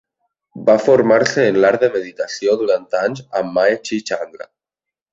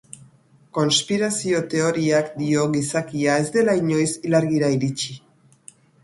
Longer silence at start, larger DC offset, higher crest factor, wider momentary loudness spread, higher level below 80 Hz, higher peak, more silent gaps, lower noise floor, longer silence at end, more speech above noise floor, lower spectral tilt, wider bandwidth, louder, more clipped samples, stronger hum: second, 0.55 s vs 0.75 s; neither; about the same, 16 dB vs 16 dB; first, 11 LU vs 5 LU; about the same, -60 dBFS vs -60 dBFS; first, -2 dBFS vs -6 dBFS; neither; first, -86 dBFS vs -54 dBFS; second, 0.7 s vs 0.85 s; first, 70 dB vs 33 dB; about the same, -5 dB/octave vs -4.5 dB/octave; second, 7.8 kHz vs 11.5 kHz; first, -16 LUFS vs -21 LUFS; neither; neither